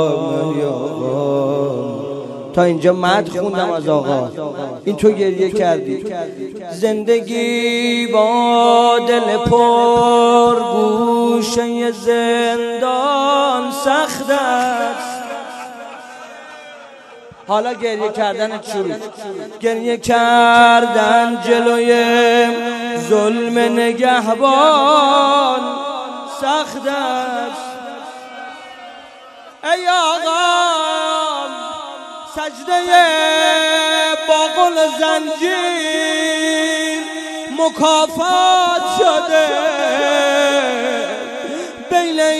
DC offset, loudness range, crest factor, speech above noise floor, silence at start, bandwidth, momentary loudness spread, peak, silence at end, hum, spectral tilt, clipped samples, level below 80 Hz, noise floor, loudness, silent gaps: under 0.1%; 9 LU; 16 dB; 25 dB; 0 s; 13 kHz; 15 LU; 0 dBFS; 0 s; none; -3.5 dB/octave; under 0.1%; -52 dBFS; -39 dBFS; -15 LUFS; none